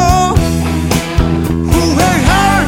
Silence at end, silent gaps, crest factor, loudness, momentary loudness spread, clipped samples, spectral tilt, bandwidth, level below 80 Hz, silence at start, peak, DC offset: 0 s; none; 10 dB; -12 LUFS; 4 LU; 0.3%; -5 dB/octave; 17.5 kHz; -18 dBFS; 0 s; 0 dBFS; under 0.1%